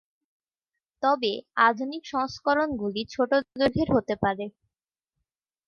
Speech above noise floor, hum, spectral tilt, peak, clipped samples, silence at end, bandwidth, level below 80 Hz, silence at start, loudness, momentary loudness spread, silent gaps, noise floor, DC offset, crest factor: 63 dB; none; -6 dB/octave; -6 dBFS; under 0.1%; 1.15 s; 7 kHz; -54 dBFS; 1 s; -26 LUFS; 8 LU; none; -89 dBFS; under 0.1%; 20 dB